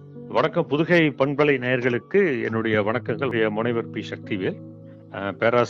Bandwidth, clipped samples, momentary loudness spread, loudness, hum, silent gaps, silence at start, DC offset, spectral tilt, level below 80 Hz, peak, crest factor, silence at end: 7.2 kHz; under 0.1%; 12 LU; -23 LUFS; none; none; 0 s; under 0.1%; -7.5 dB/octave; -64 dBFS; -8 dBFS; 16 dB; 0 s